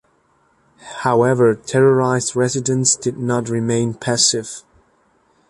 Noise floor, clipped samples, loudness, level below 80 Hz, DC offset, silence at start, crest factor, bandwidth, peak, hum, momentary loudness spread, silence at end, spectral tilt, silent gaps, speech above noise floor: -59 dBFS; under 0.1%; -17 LUFS; -56 dBFS; under 0.1%; 0.85 s; 18 dB; 11.5 kHz; -2 dBFS; none; 9 LU; 0.9 s; -4 dB/octave; none; 43 dB